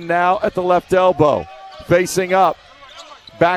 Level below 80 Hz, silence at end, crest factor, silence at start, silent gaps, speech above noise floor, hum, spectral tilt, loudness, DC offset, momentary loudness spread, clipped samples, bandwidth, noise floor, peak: -48 dBFS; 0 s; 16 dB; 0 s; none; 24 dB; none; -5 dB/octave; -16 LUFS; under 0.1%; 20 LU; under 0.1%; 14 kHz; -39 dBFS; 0 dBFS